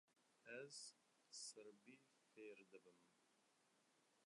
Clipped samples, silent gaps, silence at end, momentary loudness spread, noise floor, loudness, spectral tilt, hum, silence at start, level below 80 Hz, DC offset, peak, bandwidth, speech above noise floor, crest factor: under 0.1%; none; 0 s; 12 LU; -82 dBFS; -60 LUFS; -1.5 dB/octave; none; 0.1 s; under -90 dBFS; under 0.1%; -42 dBFS; 11 kHz; 19 dB; 22 dB